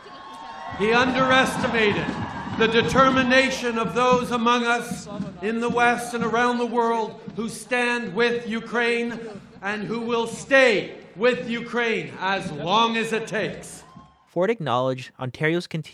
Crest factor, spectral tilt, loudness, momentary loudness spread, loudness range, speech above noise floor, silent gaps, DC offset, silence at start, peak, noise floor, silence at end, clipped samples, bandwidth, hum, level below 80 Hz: 18 dB; -4.5 dB/octave; -22 LUFS; 14 LU; 5 LU; 26 dB; none; under 0.1%; 0 s; -4 dBFS; -49 dBFS; 0 s; under 0.1%; 14 kHz; none; -54 dBFS